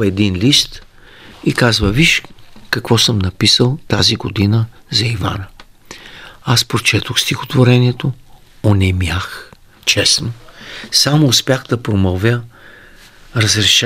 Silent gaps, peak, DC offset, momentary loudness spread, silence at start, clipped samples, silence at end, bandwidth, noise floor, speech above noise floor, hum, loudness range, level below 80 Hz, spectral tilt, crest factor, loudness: none; 0 dBFS; under 0.1%; 16 LU; 0 s; under 0.1%; 0 s; 16 kHz; -41 dBFS; 27 dB; none; 3 LU; -38 dBFS; -4 dB/octave; 16 dB; -14 LUFS